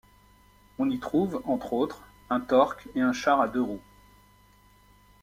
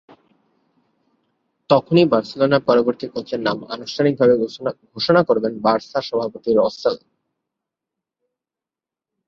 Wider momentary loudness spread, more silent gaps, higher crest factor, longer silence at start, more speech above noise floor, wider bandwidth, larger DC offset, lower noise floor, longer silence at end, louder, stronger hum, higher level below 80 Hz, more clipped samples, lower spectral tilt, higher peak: second, 9 LU vs 12 LU; neither; about the same, 20 dB vs 18 dB; second, 0.8 s vs 1.7 s; second, 32 dB vs 70 dB; first, 16 kHz vs 7.2 kHz; neither; second, -58 dBFS vs -88 dBFS; second, 1.4 s vs 2.3 s; second, -27 LUFS vs -19 LUFS; first, 50 Hz at -55 dBFS vs none; about the same, -58 dBFS vs -60 dBFS; neither; about the same, -6 dB/octave vs -7 dB/octave; second, -8 dBFS vs -2 dBFS